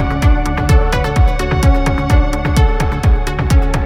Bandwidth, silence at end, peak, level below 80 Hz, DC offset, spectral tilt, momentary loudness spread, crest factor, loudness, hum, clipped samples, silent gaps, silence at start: 15.5 kHz; 0 s; 0 dBFS; -14 dBFS; under 0.1%; -6.5 dB/octave; 2 LU; 12 dB; -14 LUFS; none; under 0.1%; none; 0 s